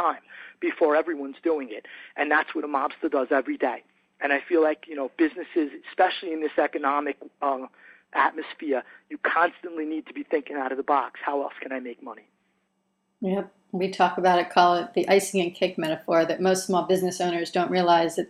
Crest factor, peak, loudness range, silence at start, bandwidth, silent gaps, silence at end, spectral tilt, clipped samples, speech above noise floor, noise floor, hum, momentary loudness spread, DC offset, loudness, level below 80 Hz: 20 dB; -6 dBFS; 7 LU; 0 s; 14.5 kHz; none; 0.05 s; -4.5 dB/octave; under 0.1%; 49 dB; -74 dBFS; none; 12 LU; under 0.1%; -25 LUFS; -72 dBFS